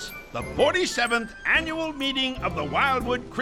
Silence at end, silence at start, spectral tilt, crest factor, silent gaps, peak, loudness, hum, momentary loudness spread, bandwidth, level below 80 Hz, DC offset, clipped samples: 0 s; 0 s; -3.5 dB/octave; 18 dB; none; -8 dBFS; -24 LUFS; none; 7 LU; 17.5 kHz; -44 dBFS; under 0.1%; under 0.1%